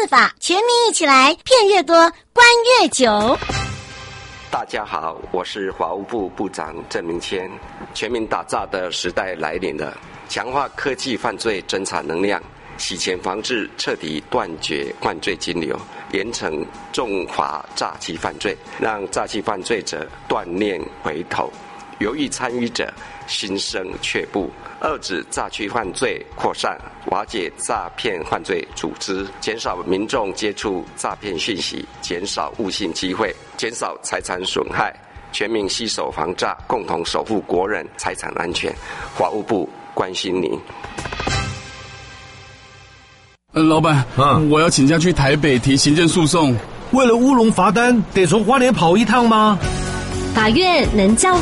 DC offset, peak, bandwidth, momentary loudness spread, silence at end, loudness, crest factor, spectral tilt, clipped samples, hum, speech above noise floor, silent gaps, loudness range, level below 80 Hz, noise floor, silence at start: under 0.1%; -2 dBFS; 11.5 kHz; 13 LU; 0 s; -19 LUFS; 18 dB; -4 dB/octave; under 0.1%; none; 30 dB; none; 10 LU; -40 dBFS; -48 dBFS; 0 s